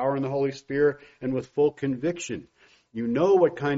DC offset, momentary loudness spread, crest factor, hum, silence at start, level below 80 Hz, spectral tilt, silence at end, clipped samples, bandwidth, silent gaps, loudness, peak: under 0.1%; 13 LU; 16 dB; none; 0 s; -62 dBFS; -6 dB/octave; 0 s; under 0.1%; 7.6 kHz; none; -26 LUFS; -8 dBFS